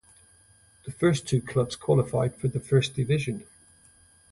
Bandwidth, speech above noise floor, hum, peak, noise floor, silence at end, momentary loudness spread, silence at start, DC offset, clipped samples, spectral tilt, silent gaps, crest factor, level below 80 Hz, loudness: 11.5 kHz; 34 dB; none; -10 dBFS; -59 dBFS; 0.9 s; 11 LU; 0.85 s; under 0.1%; under 0.1%; -6.5 dB/octave; none; 18 dB; -54 dBFS; -26 LUFS